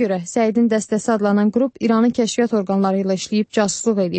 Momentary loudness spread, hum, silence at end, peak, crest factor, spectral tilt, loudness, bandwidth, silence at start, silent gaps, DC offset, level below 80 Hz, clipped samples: 4 LU; none; 0 s; -4 dBFS; 14 dB; -5.5 dB/octave; -18 LUFS; 8.8 kHz; 0 s; none; under 0.1%; -60 dBFS; under 0.1%